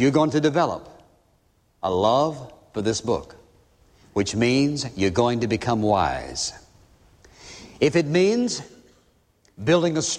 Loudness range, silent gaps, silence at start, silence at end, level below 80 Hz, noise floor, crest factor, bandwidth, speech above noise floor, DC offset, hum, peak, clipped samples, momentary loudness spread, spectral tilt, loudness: 3 LU; none; 0 s; 0 s; -52 dBFS; -63 dBFS; 18 dB; 11 kHz; 41 dB; under 0.1%; none; -6 dBFS; under 0.1%; 11 LU; -5 dB/octave; -22 LUFS